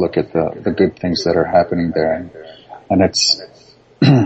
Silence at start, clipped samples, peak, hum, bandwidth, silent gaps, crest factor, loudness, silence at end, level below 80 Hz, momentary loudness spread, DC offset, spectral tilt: 0 s; under 0.1%; -2 dBFS; none; 8.4 kHz; none; 16 dB; -16 LUFS; 0 s; -50 dBFS; 7 LU; under 0.1%; -5 dB/octave